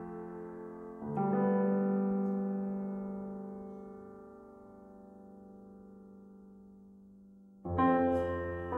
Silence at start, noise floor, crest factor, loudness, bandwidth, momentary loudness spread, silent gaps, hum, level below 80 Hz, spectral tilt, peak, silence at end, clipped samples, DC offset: 0 s; -57 dBFS; 20 dB; -34 LUFS; 4 kHz; 24 LU; none; none; -62 dBFS; -10.5 dB/octave; -16 dBFS; 0 s; under 0.1%; under 0.1%